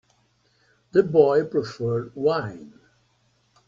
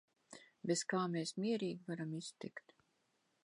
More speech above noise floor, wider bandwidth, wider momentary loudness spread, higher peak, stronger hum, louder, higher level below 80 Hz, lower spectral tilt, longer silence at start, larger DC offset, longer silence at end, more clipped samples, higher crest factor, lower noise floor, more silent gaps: first, 44 dB vs 40 dB; second, 7.4 kHz vs 11.5 kHz; second, 11 LU vs 20 LU; first, -4 dBFS vs -24 dBFS; neither; first, -22 LUFS vs -41 LUFS; first, -62 dBFS vs under -90 dBFS; first, -8 dB/octave vs -4.5 dB/octave; first, 0.95 s vs 0.3 s; neither; first, 1 s vs 0.85 s; neither; about the same, 20 dB vs 20 dB; second, -65 dBFS vs -81 dBFS; neither